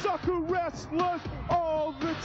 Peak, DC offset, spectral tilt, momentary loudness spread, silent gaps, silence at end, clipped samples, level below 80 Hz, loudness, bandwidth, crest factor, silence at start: -16 dBFS; under 0.1%; -6 dB/octave; 4 LU; none; 0 s; under 0.1%; -48 dBFS; -30 LUFS; 8 kHz; 14 dB; 0 s